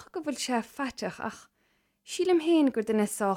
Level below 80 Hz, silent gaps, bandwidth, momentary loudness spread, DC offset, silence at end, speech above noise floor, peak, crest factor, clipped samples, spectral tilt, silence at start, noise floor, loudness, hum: -70 dBFS; none; 16 kHz; 13 LU; under 0.1%; 0 s; 44 dB; -14 dBFS; 16 dB; under 0.1%; -4.5 dB/octave; 0 s; -72 dBFS; -29 LUFS; none